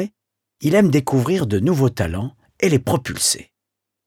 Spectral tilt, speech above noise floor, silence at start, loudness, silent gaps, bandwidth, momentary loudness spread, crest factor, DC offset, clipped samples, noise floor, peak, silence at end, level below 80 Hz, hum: -5 dB/octave; 64 dB; 0 s; -19 LUFS; none; 18 kHz; 9 LU; 16 dB; under 0.1%; under 0.1%; -82 dBFS; -4 dBFS; 0.65 s; -46 dBFS; none